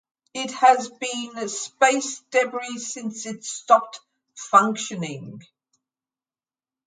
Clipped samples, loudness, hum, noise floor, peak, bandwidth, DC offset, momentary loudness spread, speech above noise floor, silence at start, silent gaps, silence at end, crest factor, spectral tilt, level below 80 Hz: under 0.1%; -22 LUFS; none; under -90 dBFS; -2 dBFS; 9.6 kHz; under 0.1%; 18 LU; over 67 dB; 0.35 s; none; 1.45 s; 22 dB; -2.5 dB/octave; -78 dBFS